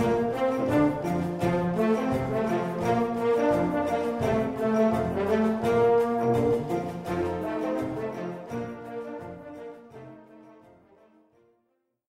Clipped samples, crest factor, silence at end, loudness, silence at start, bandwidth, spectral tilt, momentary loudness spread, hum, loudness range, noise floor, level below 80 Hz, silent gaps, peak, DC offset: under 0.1%; 14 dB; 1.55 s; -26 LUFS; 0 s; 15.5 kHz; -7.5 dB/octave; 15 LU; none; 14 LU; -74 dBFS; -54 dBFS; none; -12 dBFS; under 0.1%